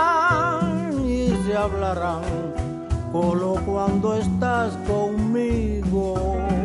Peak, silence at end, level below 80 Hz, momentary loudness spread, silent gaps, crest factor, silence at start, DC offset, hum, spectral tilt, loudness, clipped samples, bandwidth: -8 dBFS; 0 s; -32 dBFS; 6 LU; none; 14 dB; 0 s; under 0.1%; none; -7.5 dB/octave; -23 LUFS; under 0.1%; 11.5 kHz